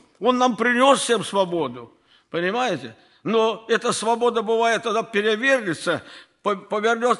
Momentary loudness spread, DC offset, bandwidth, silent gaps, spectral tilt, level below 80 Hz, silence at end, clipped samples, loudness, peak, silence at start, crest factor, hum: 11 LU; under 0.1%; 12 kHz; none; -3.5 dB/octave; -70 dBFS; 0 s; under 0.1%; -21 LUFS; -4 dBFS; 0.2 s; 18 dB; none